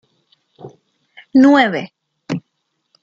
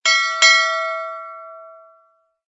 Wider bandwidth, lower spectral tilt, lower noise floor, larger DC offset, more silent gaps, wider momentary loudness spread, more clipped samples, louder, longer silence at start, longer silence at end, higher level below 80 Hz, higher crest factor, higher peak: about the same, 7.4 kHz vs 8 kHz; first, -6 dB/octave vs 5 dB/octave; first, -71 dBFS vs -60 dBFS; neither; neither; second, 16 LU vs 23 LU; neither; about the same, -15 LUFS vs -14 LUFS; first, 0.65 s vs 0.05 s; second, 0.65 s vs 0.8 s; first, -64 dBFS vs -84 dBFS; about the same, 16 dB vs 20 dB; about the same, -2 dBFS vs 0 dBFS